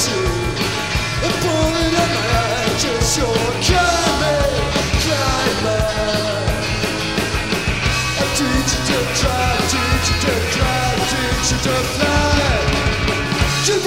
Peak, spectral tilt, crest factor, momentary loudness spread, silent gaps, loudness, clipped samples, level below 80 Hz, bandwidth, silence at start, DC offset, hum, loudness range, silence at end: -2 dBFS; -3.5 dB/octave; 16 dB; 4 LU; none; -17 LUFS; under 0.1%; -26 dBFS; 16 kHz; 0 s; 0.8%; none; 2 LU; 0 s